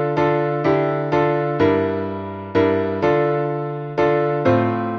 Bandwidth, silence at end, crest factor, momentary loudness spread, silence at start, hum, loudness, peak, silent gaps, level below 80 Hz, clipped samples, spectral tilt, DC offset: 6.6 kHz; 0 s; 14 dB; 7 LU; 0 s; none; -19 LUFS; -4 dBFS; none; -52 dBFS; under 0.1%; -8.5 dB/octave; under 0.1%